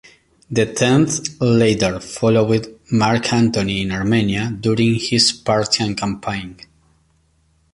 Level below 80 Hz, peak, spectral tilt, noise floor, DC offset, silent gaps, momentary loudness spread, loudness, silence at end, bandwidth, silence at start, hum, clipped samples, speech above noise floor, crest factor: -46 dBFS; -2 dBFS; -5 dB/octave; -59 dBFS; under 0.1%; none; 8 LU; -17 LUFS; 1.2 s; 11.5 kHz; 0.5 s; none; under 0.1%; 42 dB; 16 dB